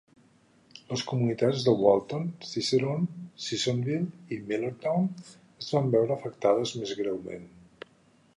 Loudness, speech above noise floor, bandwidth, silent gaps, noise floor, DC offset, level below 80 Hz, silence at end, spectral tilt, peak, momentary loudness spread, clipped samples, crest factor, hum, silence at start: -28 LUFS; 34 dB; 11 kHz; none; -62 dBFS; under 0.1%; -68 dBFS; 0.9 s; -6 dB/octave; -6 dBFS; 17 LU; under 0.1%; 22 dB; none; 0.9 s